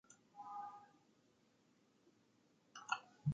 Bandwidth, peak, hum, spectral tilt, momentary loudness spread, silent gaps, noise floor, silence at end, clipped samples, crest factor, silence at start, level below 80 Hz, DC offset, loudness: 7.8 kHz; -24 dBFS; none; -5 dB/octave; 18 LU; none; -75 dBFS; 0 s; under 0.1%; 28 dB; 0.1 s; -82 dBFS; under 0.1%; -49 LUFS